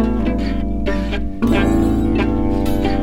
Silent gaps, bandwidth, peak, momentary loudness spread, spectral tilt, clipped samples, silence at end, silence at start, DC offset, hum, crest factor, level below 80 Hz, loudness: none; 16 kHz; -4 dBFS; 6 LU; -7.5 dB/octave; under 0.1%; 0 s; 0 s; under 0.1%; none; 12 dB; -24 dBFS; -18 LUFS